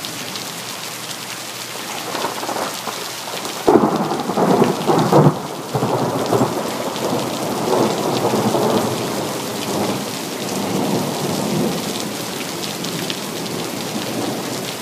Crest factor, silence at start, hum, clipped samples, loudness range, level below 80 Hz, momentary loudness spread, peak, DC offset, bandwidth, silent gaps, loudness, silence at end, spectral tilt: 20 dB; 0 s; none; under 0.1%; 6 LU; -58 dBFS; 10 LU; 0 dBFS; under 0.1%; 16 kHz; none; -20 LUFS; 0 s; -4.5 dB/octave